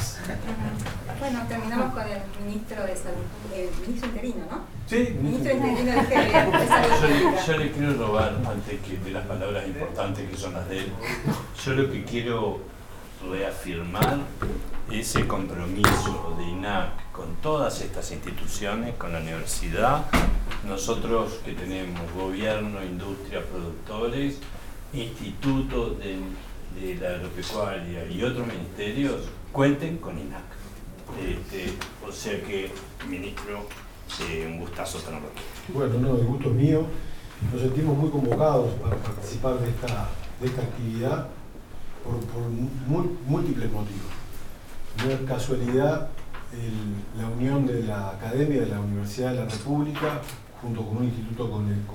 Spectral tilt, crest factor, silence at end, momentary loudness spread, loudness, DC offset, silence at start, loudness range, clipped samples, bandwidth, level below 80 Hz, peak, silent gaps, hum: -6 dB/octave; 26 dB; 0 s; 14 LU; -27 LUFS; under 0.1%; 0 s; 8 LU; under 0.1%; 18 kHz; -38 dBFS; 0 dBFS; none; none